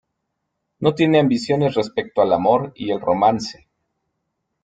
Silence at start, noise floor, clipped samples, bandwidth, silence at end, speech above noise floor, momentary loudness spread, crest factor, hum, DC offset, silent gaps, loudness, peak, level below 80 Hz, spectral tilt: 0.8 s; -76 dBFS; under 0.1%; 9.2 kHz; 1.1 s; 58 dB; 8 LU; 18 dB; none; under 0.1%; none; -19 LUFS; -2 dBFS; -58 dBFS; -6.5 dB/octave